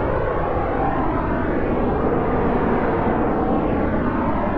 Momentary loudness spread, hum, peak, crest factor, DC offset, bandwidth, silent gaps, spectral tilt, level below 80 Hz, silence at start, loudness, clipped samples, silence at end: 2 LU; none; -8 dBFS; 12 dB; under 0.1%; 5.2 kHz; none; -10.5 dB/octave; -30 dBFS; 0 s; -21 LUFS; under 0.1%; 0 s